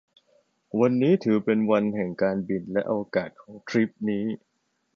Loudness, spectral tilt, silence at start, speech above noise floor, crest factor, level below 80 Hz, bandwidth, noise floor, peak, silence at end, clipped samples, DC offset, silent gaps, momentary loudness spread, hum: -25 LUFS; -8 dB/octave; 0.75 s; 41 dB; 16 dB; -66 dBFS; 7 kHz; -66 dBFS; -8 dBFS; 0.6 s; under 0.1%; under 0.1%; none; 11 LU; none